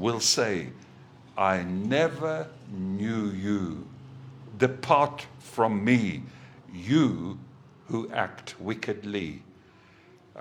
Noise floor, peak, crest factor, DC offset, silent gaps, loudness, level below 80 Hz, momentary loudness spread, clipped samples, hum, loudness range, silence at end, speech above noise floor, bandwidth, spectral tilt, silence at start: -55 dBFS; -6 dBFS; 22 dB; under 0.1%; none; -28 LUFS; -64 dBFS; 19 LU; under 0.1%; none; 4 LU; 0 s; 28 dB; 17 kHz; -4.5 dB/octave; 0 s